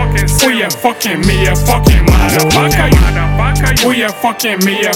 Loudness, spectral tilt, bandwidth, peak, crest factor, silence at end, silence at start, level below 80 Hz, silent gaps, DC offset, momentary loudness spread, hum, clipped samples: -11 LUFS; -4.5 dB/octave; 18.5 kHz; 0 dBFS; 10 dB; 0 s; 0 s; -16 dBFS; none; 0.4%; 4 LU; none; 0.1%